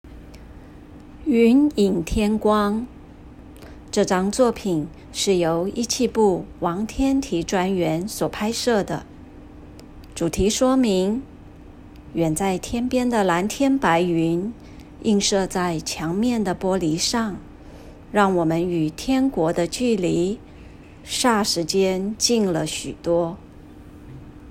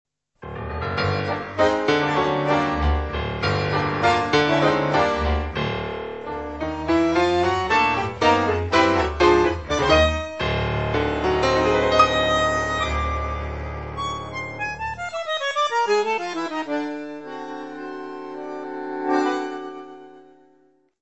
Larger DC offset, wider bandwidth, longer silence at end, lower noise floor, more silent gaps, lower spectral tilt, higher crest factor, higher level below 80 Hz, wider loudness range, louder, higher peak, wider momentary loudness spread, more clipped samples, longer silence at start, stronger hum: second, under 0.1% vs 0.2%; first, 16 kHz vs 8.4 kHz; second, 0 s vs 0.8 s; second, -42 dBFS vs -60 dBFS; neither; about the same, -4.5 dB/octave vs -5.5 dB/octave; about the same, 18 dB vs 20 dB; second, -42 dBFS vs -36 dBFS; second, 2 LU vs 9 LU; about the same, -21 LUFS vs -22 LUFS; about the same, -4 dBFS vs -2 dBFS; second, 11 LU vs 15 LU; neither; second, 0.05 s vs 0.4 s; neither